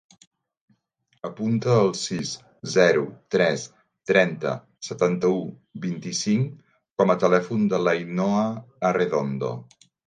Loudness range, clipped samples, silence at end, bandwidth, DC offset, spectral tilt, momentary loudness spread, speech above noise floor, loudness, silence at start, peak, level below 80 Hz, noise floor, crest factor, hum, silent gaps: 2 LU; under 0.1%; 0.45 s; 9.6 kHz; under 0.1%; -5.5 dB/octave; 14 LU; 47 dB; -23 LUFS; 1.25 s; -4 dBFS; -66 dBFS; -70 dBFS; 20 dB; none; none